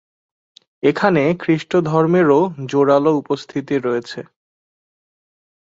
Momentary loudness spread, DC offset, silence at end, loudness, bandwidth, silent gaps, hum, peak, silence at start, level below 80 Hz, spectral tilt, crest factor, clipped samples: 9 LU; under 0.1%; 1.55 s; -17 LUFS; 7.8 kHz; none; none; -2 dBFS; 0.85 s; -60 dBFS; -7.5 dB/octave; 16 dB; under 0.1%